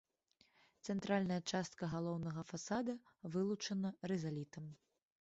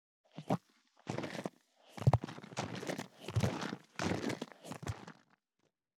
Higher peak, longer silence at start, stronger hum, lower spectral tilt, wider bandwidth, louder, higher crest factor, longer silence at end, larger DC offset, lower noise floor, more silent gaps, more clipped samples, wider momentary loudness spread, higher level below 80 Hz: second, -24 dBFS vs -12 dBFS; first, 0.85 s vs 0.35 s; neither; about the same, -5.5 dB/octave vs -6 dB/octave; second, 8 kHz vs 15 kHz; second, -42 LUFS vs -39 LUFS; second, 18 dB vs 28 dB; second, 0.45 s vs 0.85 s; neither; second, -76 dBFS vs -82 dBFS; neither; neither; second, 11 LU vs 16 LU; second, -74 dBFS vs -64 dBFS